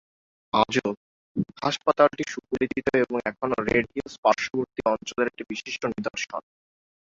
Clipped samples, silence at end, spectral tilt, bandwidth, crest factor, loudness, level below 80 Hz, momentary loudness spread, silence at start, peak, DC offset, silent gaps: under 0.1%; 0.65 s; -4.5 dB/octave; 7.8 kHz; 22 dB; -26 LUFS; -58 dBFS; 11 LU; 0.55 s; -4 dBFS; under 0.1%; 0.97-1.35 s, 4.18-4.23 s